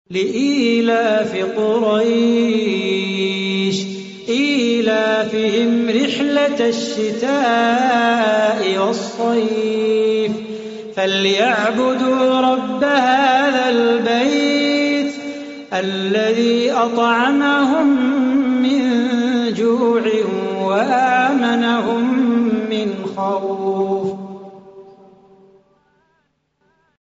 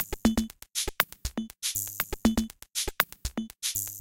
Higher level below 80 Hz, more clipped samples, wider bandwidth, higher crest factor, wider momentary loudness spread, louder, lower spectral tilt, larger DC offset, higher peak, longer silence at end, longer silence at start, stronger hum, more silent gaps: second, -62 dBFS vs -42 dBFS; neither; second, 8 kHz vs 17 kHz; second, 14 dB vs 26 dB; about the same, 6 LU vs 7 LU; first, -16 LUFS vs -30 LUFS; about the same, -3 dB/octave vs -2.5 dB/octave; neither; about the same, -2 dBFS vs -4 dBFS; first, 2.1 s vs 0 s; about the same, 0.1 s vs 0 s; neither; neither